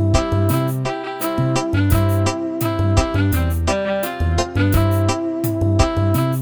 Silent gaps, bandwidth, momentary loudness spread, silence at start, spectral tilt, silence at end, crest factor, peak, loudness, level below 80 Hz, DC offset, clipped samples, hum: none; over 20 kHz; 5 LU; 0 s; -6.5 dB/octave; 0 s; 16 dB; 0 dBFS; -19 LUFS; -28 dBFS; 0.3%; under 0.1%; none